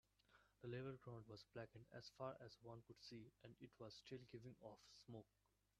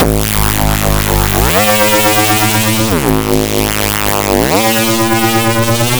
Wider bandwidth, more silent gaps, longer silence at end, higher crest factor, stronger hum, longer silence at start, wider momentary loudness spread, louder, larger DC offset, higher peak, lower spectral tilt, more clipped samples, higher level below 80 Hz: second, 13 kHz vs over 20 kHz; neither; first, 0.55 s vs 0 s; first, 22 dB vs 12 dB; neither; first, 0.3 s vs 0 s; first, 9 LU vs 4 LU; second, -59 LUFS vs -10 LUFS; second, under 0.1% vs 3%; second, -38 dBFS vs 0 dBFS; first, -6 dB/octave vs -4 dB/octave; second, under 0.1% vs 0.2%; second, -84 dBFS vs -22 dBFS